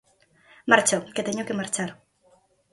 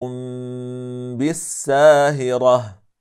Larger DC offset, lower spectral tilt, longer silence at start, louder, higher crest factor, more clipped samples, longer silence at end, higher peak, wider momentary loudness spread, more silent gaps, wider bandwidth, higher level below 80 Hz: neither; second, -3 dB/octave vs -5 dB/octave; first, 0.65 s vs 0 s; second, -24 LUFS vs -17 LUFS; first, 26 dB vs 16 dB; neither; first, 0.8 s vs 0.25 s; about the same, 0 dBFS vs -2 dBFS; second, 13 LU vs 17 LU; neither; second, 12 kHz vs 14 kHz; about the same, -68 dBFS vs -64 dBFS